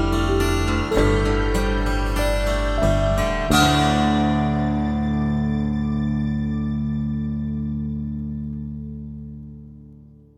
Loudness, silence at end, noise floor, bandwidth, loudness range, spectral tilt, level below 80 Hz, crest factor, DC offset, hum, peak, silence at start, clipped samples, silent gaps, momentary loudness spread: -22 LUFS; 0.3 s; -46 dBFS; 16.5 kHz; 8 LU; -6 dB/octave; -28 dBFS; 18 dB; under 0.1%; none; -4 dBFS; 0 s; under 0.1%; none; 13 LU